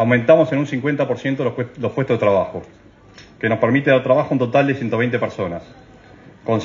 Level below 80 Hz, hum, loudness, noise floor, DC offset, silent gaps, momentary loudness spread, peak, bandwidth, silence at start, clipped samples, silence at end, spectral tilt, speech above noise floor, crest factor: -56 dBFS; none; -18 LUFS; -45 dBFS; under 0.1%; none; 12 LU; 0 dBFS; 7.4 kHz; 0 s; under 0.1%; 0 s; -8 dB/octave; 27 dB; 18 dB